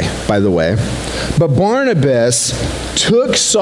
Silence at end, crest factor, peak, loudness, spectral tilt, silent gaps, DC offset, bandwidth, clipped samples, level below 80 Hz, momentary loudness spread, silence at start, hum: 0 s; 12 dB; -2 dBFS; -14 LUFS; -4 dB/octave; none; under 0.1%; 12 kHz; under 0.1%; -32 dBFS; 6 LU; 0 s; none